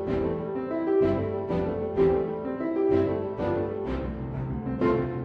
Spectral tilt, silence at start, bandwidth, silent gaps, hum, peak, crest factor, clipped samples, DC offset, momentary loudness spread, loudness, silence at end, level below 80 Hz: -10 dB/octave; 0 s; 5.2 kHz; none; none; -12 dBFS; 14 dB; under 0.1%; under 0.1%; 8 LU; -27 LUFS; 0 s; -44 dBFS